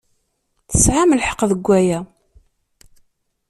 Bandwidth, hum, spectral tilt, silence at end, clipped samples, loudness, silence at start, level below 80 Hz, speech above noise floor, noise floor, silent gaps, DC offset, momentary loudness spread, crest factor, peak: 14.5 kHz; none; -4.5 dB/octave; 1.45 s; under 0.1%; -16 LUFS; 0.7 s; -34 dBFS; 53 dB; -68 dBFS; none; under 0.1%; 10 LU; 20 dB; 0 dBFS